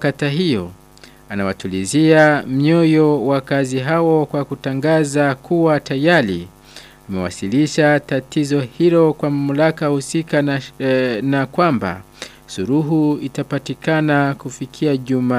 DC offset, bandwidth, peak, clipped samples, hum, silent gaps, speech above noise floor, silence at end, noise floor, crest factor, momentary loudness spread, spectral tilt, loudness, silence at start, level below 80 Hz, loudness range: under 0.1%; 15 kHz; 0 dBFS; under 0.1%; none; none; 28 dB; 0 s; -44 dBFS; 16 dB; 11 LU; -6 dB/octave; -17 LUFS; 0 s; -52 dBFS; 4 LU